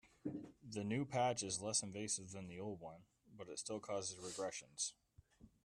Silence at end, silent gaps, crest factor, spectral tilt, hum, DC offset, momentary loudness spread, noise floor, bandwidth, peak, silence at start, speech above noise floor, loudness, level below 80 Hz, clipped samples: 0.15 s; none; 20 dB; -3.5 dB/octave; none; under 0.1%; 13 LU; -67 dBFS; 13.5 kHz; -26 dBFS; 0.05 s; 23 dB; -44 LUFS; -76 dBFS; under 0.1%